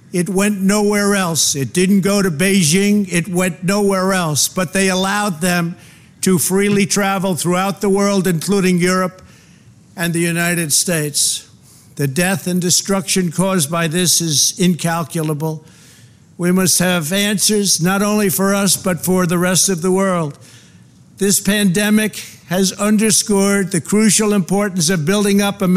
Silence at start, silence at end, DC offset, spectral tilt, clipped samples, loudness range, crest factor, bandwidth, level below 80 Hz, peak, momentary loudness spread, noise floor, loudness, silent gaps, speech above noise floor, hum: 0.1 s; 0 s; 0.3%; -4 dB/octave; under 0.1%; 3 LU; 14 dB; 16 kHz; -48 dBFS; -2 dBFS; 6 LU; -45 dBFS; -15 LUFS; none; 30 dB; none